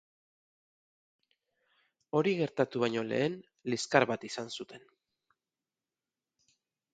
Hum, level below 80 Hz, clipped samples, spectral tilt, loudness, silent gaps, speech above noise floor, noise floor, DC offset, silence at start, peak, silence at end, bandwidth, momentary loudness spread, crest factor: none; -78 dBFS; under 0.1%; -5 dB/octave; -32 LUFS; none; over 58 dB; under -90 dBFS; under 0.1%; 2.15 s; -8 dBFS; 2.15 s; 9.4 kHz; 14 LU; 28 dB